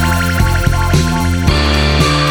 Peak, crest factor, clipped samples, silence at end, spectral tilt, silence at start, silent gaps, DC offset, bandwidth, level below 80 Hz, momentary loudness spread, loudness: 0 dBFS; 12 dB; under 0.1%; 0 s; -5 dB/octave; 0 s; none; 0.4%; over 20 kHz; -18 dBFS; 2 LU; -13 LUFS